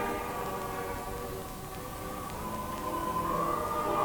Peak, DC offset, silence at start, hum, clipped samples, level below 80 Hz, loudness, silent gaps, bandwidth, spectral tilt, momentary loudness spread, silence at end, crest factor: -16 dBFS; under 0.1%; 0 s; none; under 0.1%; -48 dBFS; -35 LUFS; none; 19.5 kHz; -5 dB/octave; 9 LU; 0 s; 18 dB